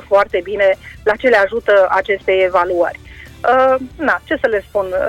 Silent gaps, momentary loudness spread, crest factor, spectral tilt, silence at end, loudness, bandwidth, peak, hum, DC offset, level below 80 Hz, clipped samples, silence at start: none; 7 LU; 14 dB; -5.5 dB/octave; 0 s; -15 LUFS; 12.5 kHz; -2 dBFS; none; under 0.1%; -42 dBFS; under 0.1%; 0.1 s